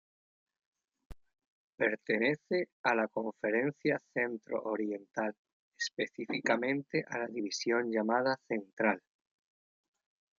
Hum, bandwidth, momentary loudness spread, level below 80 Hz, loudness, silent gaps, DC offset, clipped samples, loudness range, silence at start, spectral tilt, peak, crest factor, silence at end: none; 7.4 kHz; 7 LU; -68 dBFS; -34 LUFS; 1.47-1.78 s, 2.72-2.84 s, 5.38-5.45 s, 5.52-5.72 s, 8.73-8.77 s; under 0.1%; under 0.1%; 2 LU; 1.1 s; -4.5 dB/octave; -12 dBFS; 22 dB; 1.4 s